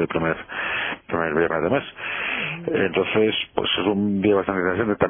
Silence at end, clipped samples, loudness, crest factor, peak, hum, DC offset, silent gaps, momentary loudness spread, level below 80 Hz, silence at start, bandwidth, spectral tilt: 0 s; under 0.1%; -22 LUFS; 18 dB; -4 dBFS; none; under 0.1%; none; 6 LU; -52 dBFS; 0 s; 3.6 kHz; -9.5 dB/octave